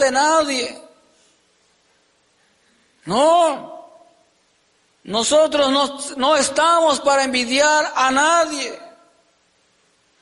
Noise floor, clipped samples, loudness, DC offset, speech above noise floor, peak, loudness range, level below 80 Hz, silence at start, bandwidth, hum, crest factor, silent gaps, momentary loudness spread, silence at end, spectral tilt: -61 dBFS; under 0.1%; -17 LUFS; under 0.1%; 44 dB; -6 dBFS; 7 LU; -60 dBFS; 0 s; 11.5 kHz; none; 14 dB; none; 13 LU; 1.35 s; -1.5 dB/octave